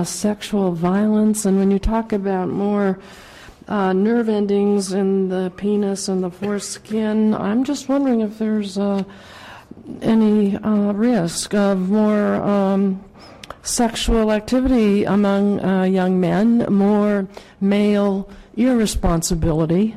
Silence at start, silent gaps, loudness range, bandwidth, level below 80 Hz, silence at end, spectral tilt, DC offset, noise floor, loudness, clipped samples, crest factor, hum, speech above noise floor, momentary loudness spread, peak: 0 s; none; 3 LU; 14 kHz; -36 dBFS; 0 s; -6 dB/octave; under 0.1%; -39 dBFS; -19 LUFS; under 0.1%; 10 dB; none; 21 dB; 8 LU; -8 dBFS